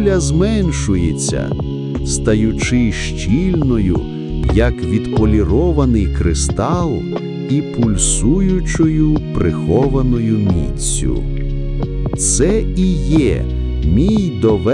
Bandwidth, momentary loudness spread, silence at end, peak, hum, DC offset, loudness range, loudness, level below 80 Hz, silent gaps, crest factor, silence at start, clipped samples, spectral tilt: 11 kHz; 7 LU; 0 s; 0 dBFS; none; under 0.1%; 2 LU; -16 LUFS; -22 dBFS; none; 14 dB; 0 s; under 0.1%; -6 dB/octave